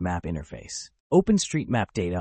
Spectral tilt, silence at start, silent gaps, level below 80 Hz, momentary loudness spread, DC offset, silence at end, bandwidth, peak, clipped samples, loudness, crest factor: -5.5 dB/octave; 0 s; 1.00-1.10 s; -48 dBFS; 15 LU; under 0.1%; 0 s; 8.8 kHz; -8 dBFS; under 0.1%; -25 LUFS; 18 dB